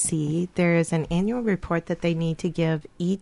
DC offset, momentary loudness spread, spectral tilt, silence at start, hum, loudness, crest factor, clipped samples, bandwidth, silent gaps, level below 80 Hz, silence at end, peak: under 0.1%; 5 LU; -6 dB/octave; 0 s; none; -25 LUFS; 16 dB; under 0.1%; 11.5 kHz; none; -48 dBFS; 0 s; -8 dBFS